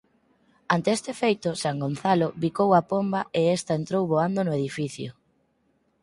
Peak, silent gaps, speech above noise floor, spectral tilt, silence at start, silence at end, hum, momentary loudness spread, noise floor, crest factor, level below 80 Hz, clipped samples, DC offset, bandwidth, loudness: -6 dBFS; none; 44 dB; -6 dB/octave; 0.7 s; 0.9 s; none; 7 LU; -69 dBFS; 20 dB; -64 dBFS; under 0.1%; under 0.1%; 11.5 kHz; -25 LUFS